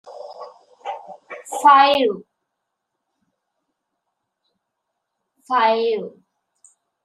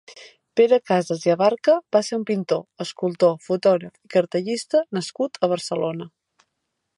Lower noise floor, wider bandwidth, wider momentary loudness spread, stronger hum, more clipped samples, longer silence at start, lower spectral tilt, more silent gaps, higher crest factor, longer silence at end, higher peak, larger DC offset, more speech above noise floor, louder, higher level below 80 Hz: about the same, -79 dBFS vs -78 dBFS; first, 13.5 kHz vs 11.5 kHz; first, 25 LU vs 9 LU; neither; neither; about the same, 0.05 s vs 0.1 s; second, -3 dB/octave vs -5.5 dB/octave; neither; about the same, 22 dB vs 18 dB; about the same, 0.95 s vs 0.9 s; about the same, -2 dBFS vs -4 dBFS; neither; first, 63 dB vs 57 dB; first, -16 LUFS vs -22 LUFS; about the same, -74 dBFS vs -74 dBFS